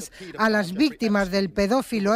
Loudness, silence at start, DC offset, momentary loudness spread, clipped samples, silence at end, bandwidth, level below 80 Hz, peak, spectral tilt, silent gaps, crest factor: -23 LUFS; 0 s; under 0.1%; 3 LU; under 0.1%; 0 s; 16 kHz; -48 dBFS; -6 dBFS; -5 dB/octave; none; 16 dB